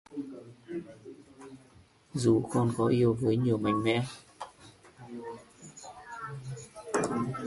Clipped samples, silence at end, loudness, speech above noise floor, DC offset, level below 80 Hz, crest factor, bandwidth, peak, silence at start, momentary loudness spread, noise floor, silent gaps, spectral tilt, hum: under 0.1%; 0 s; -30 LUFS; 32 dB; under 0.1%; -62 dBFS; 18 dB; 11.5 kHz; -14 dBFS; 0.1 s; 23 LU; -59 dBFS; none; -6.5 dB/octave; none